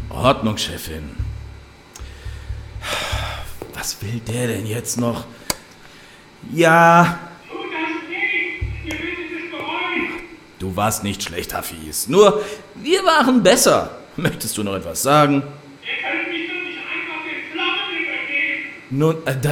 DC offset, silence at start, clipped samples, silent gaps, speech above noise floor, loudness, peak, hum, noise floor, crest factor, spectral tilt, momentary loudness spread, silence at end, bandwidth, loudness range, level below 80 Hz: under 0.1%; 0 s; under 0.1%; none; 26 dB; -19 LUFS; 0 dBFS; none; -44 dBFS; 20 dB; -4 dB/octave; 18 LU; 0 s; 17.5 kHz; 9 LU; -40 dBFS